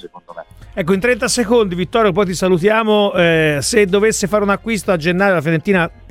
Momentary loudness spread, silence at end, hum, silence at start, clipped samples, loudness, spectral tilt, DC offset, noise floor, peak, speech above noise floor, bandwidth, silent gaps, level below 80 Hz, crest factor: 5 LU; 0 s; none; 0.05 s; under 0.1%; -15 LUFS; -4.5 dB/octave; under 0.1%; -35 dBFS; 0 dBFS; 21 dB; 16 kHz; none; -40 dBFS; 16 dB